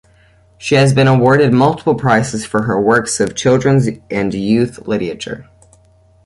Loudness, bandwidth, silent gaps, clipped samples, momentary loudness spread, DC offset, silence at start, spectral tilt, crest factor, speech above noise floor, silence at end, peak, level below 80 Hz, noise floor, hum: -14 LUFS; 11.5 kHz; none; under 0.1%; 10 LU; under 0.1%; 0.6 s; -6 dB/octave; 14 dB; 36 dB; 0.85 s; 0 dBFS; -46 dBFS; -49 dBFS; none